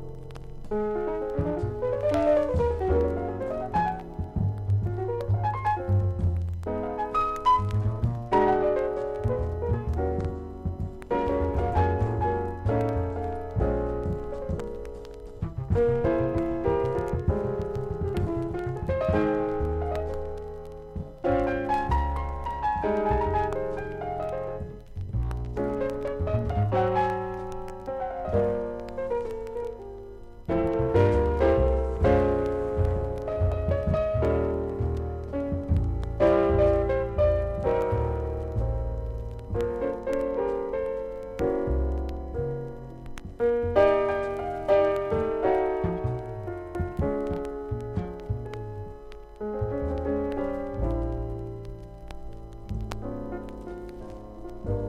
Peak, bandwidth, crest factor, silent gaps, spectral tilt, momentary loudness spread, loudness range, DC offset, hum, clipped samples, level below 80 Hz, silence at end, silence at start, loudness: -8 dBFS; 9.8 kHz; 18 dB; none; -9 dB/octave; 14 LU; 7 LU; under 0.1%; none; under 0.1%; -36 dBFS; 0 s; 0 s; -28 LUFS